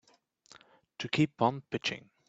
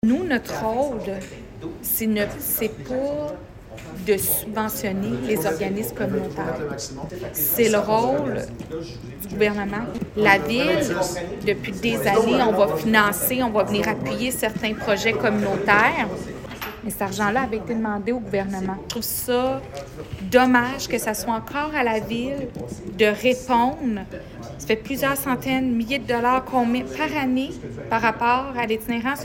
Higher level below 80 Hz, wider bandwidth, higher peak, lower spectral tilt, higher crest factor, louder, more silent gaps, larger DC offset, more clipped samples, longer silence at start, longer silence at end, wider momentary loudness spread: second, -72 dBFS vs -46 dBFS; second, 8 kHz vs 17 kHz; second, -12 dBFS vs 0 dBFS; about the same, -5.5 dB/octave vs -4.5 dB/octave; about the same, 22 dB vs 22 dB; second, -32 LUFS vs -22 LUFS; neither; neither; neither; first, 1 s vs 0.05 s; first, 0.3 s vs 0 s; about the same, 13 LU vs 14 LU